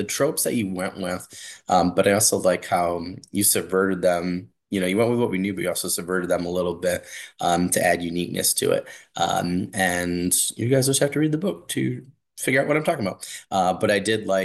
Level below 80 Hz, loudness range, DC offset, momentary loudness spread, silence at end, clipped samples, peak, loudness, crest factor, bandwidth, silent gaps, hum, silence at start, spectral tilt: -58 dBFS; 2 LU; under 0.1%; 10 LU; 0 s; under 0.1%; -4 dBFS; -22 LUFS; 18 dB; 13 kHz; none; none; 0 s; -4 dB/octave